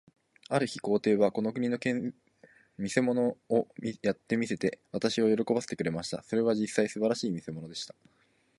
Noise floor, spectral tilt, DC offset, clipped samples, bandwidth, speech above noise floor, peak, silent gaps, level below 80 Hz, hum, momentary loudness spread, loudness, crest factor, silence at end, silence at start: -61 dBFS; -5.5 dB/octave; under 0.1%; under 0.1%; 11.5 kHz; 31 dB; -10 dBFS; none; -68 dBFS; none; 11 LU; -30 LUFS; 20 dB; 0.75 s; 0.5 s